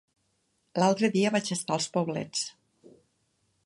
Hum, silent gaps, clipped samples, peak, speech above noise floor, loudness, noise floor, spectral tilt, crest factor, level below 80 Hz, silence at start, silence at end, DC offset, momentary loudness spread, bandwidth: none; none; under 0.1%; -10 dBFS; 47 dB; -28 LUFS; -74 dBFS; -4.5 dB/octave; 22 dB; -76 dBFS; 0.75 s; 1.15 s; under 0.1%; 9 LU; 11.5 kHz